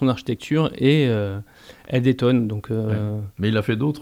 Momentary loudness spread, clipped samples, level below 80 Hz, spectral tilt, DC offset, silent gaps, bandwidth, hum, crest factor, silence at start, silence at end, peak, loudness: 8 LU; under 0.1%; -54 dBFS; -8 dB/octave; under 0.1%; none; 16 kHz; none; 16 dB; 0 s; 0 s; -6 dBFS; -21 LUFS